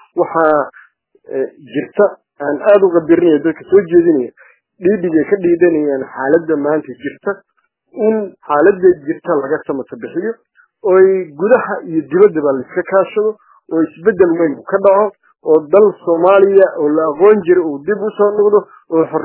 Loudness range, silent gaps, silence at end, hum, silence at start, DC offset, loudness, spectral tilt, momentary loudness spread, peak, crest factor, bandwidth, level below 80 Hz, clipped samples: 4 LU; none; 0 s; none; 0.15 s; under 0.1%; -13 LUFS; -11 dB/octave; 12 LU; 0 dBFS; 14 dB; 3.2 kHz; -58 dBFS; under 0.1%